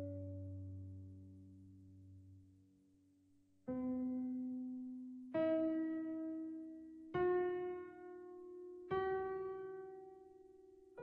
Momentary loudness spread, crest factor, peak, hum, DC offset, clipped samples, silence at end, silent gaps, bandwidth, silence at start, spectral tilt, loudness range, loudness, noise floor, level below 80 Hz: 23 LU; 16 dB; -28 dBFS; none; under 0.1%; under 0.1%; 0 s; none; 4.6 kHz; 0 s; -9.5 dB/octave; 12 LU; -43 LUFS; -72 dBFS; -76 dBFS